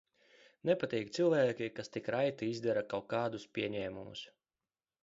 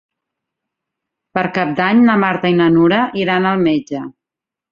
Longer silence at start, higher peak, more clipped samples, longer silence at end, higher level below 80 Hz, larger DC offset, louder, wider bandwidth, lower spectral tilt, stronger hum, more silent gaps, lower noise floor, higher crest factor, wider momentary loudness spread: second, 0.65 s vs 1.35 s; second, -18 dBFS vs -2 dBFS; neither; first, 0.75 s vs 0.6 s; second, -74 dBFS vs -56 dBFS; neither; second, -36 LUFS vs -14 LUFS; about the same, 7.6 kHz vs 7 kHz; second, -4.5 dB/octave vs -7.5 dB/octave; neither; neither; first, under -90 dBFS vs -86 dBFS; first, 20 dB vs 14 dB; about the same, 11 LU vs 12 LU